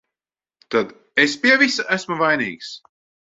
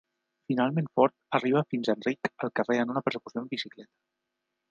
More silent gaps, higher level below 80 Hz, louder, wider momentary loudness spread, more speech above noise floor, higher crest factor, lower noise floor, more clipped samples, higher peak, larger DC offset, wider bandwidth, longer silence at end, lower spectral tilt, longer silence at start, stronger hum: neither; first, -66 dBFS vs -78 dBFS; first, -18 LUFS vs -29 LUFS; first, 17 LU vs 9 LU; first, over 71 dB vs 55 dB; about the same, 20 dB vs 22 dB; first, under -90 dBFS vs -84 dBFS; neither; first, -2 dBFS vs -8 dBFS; neither; about the same, 7.8 kHz vs 7.4 kHz; second, 0.55 s vs 0.9 s; second, -3.5 dB/octave vs -7 dB/octave; first, 0.7 s vs 0.5 s; neither